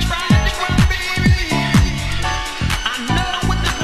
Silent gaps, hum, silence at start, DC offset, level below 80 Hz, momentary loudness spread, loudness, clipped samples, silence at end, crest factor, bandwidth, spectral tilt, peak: none; none; 0 s; under 0.1%; -22 dBFS; 5 LU; -17 LUFS; under 0.1%; 0 s; 16 dB; 14 kHz; -4.5 dB/octave; 0 dBFS